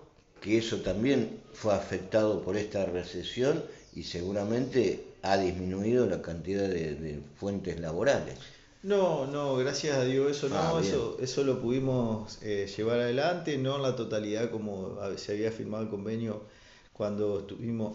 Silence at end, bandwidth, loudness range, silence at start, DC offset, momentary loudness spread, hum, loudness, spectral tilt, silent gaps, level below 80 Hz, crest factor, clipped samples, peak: 0 s; 8 kHz; 4 LU; 0 s; under 0.1%; 9 LU; none; -31 LUFS; -5.5 dB/octave; none; -56 dBFS; 18 dB; under 0.1%; -12 dBFS